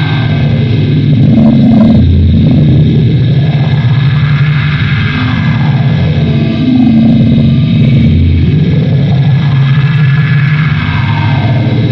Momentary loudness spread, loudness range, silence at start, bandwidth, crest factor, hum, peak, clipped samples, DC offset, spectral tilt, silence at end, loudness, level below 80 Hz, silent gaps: 4 LU; 2 LU; 0 s; 6 kHz; 6 dB; none; 0 dBFS; under 0.1%; under 0.1%; -9.5 dB/octave; 0 s; -8 LUFS; -28 dBFS; none